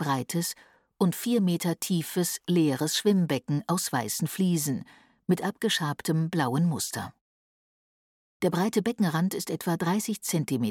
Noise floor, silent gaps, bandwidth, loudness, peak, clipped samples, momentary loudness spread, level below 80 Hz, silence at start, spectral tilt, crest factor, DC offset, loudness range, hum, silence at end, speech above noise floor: under -90 dBFS; 7.21-8.40 s; 18.5 kHz; -27 LUFS; -12 dBFS; under 0.1%; 6 LU; -70 dBFS; 0 s; -5 dB/octave; 16 dB; under 0.1%; 3 LU; none; 0 s; over 63 dB